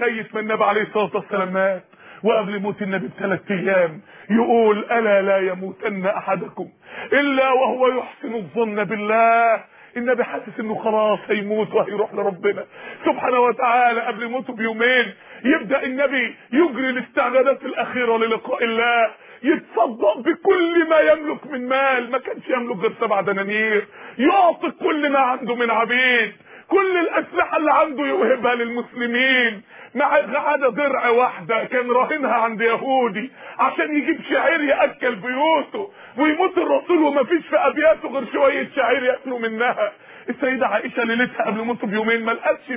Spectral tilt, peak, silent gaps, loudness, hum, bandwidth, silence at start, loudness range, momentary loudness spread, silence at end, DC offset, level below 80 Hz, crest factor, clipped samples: -8.5 dB/octave; -4 dBFS; none; -19 LUFS; none; 3.8 kHz; 0 s; 3 LU; 9 LU; 0 s; under 0.1%; -66 dBFS; 16 dB; under 0.1%